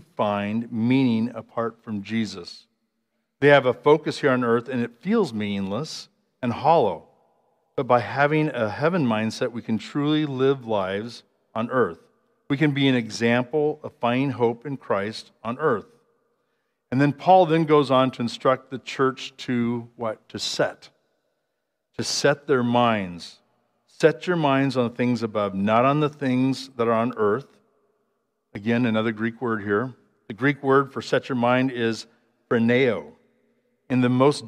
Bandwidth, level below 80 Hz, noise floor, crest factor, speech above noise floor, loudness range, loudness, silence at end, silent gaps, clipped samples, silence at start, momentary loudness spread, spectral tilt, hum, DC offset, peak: 11.5 kHz; -70 dBFS; -78 dBFS; 22 dB; 56 dB; 5 LU; -23 LUFS; 0 s; none; under 0.1%; 0.2 s; 12 LU; -6 dB/octave; none; under 0.1%; -2 dBFS